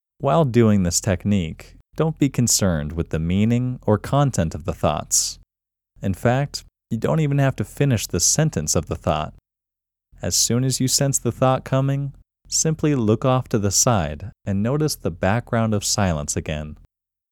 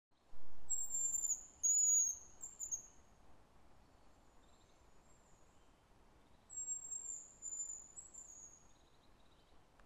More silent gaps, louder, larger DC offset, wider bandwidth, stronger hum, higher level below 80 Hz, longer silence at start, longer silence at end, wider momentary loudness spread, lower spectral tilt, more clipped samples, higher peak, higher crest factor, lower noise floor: neither; first, -20 LUFS vs -38 LUFS; neither; about the same, 18.5 kHz vs over 20 kHz; neither; first, -42 dBFS vs -70 dBFS; about the same, 0.2 s vs 0.1 s; first, 0.55 s vs 0.05 s; second, 11 LU vs 22 LU; first, -4.5 dB/octave vs -0.5 dB/octave; neither; first, -4 dBFS vs -26 dBFS; about the same, 18 dB vs 16 dB; first, -87 dBFS vs -67 dBFS